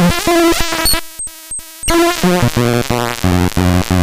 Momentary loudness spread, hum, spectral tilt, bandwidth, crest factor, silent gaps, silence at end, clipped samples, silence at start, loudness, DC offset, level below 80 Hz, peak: 12 LU; none; -4.5 dB/octave; 16 kHz; 12 dB; none; 0 s; under 0.1%; 0 s; -13 LUFS; under 0.1%; -28 dBFS; 0 dBFS